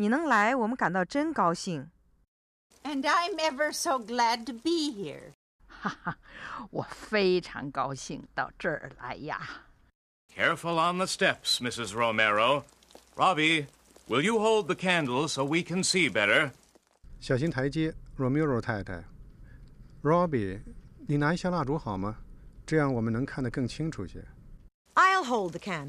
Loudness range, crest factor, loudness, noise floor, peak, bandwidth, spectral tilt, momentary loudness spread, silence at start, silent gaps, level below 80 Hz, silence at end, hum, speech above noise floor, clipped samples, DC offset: 6 LU; 20 dB; -28 LUFS; -56 dBFS; -10 dBFS; 14.5 kHz; -4.5 dB/octave; 16 LU; 0 s; 2.28-2.70 s, 5.34-5.59 s, 9.95-10.29 s, 24.74-24.85 s; -54 dBFS; 0 s; none; 27 dB; under 0.1%; under 0.1%